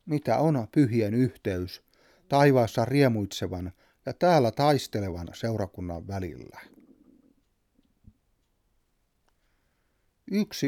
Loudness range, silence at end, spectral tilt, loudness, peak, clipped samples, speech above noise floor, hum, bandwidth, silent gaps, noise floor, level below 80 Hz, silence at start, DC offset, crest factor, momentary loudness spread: 16 LU; 0 s; -6.5 dB/octave; -26 LUFS; -8 dBFS; under 0.1%; 46 dB; none; 17 kHz; none; -72 dBFS; -58 dBFS; 0.05 s; under 0.1%; 20 dB; 17 LU